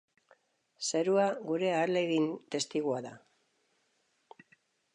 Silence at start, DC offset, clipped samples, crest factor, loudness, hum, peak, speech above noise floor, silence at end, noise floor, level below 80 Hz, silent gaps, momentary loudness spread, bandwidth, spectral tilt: 0.8 s; under 0.1%; under 0.1%; 18 dB; -31 LUFS; none; -16 dBFS; 44 dB; 1.75 s; -75 dBFS; -88 dBFS; none; 8 LU; 11 kHz; -4 dB/octave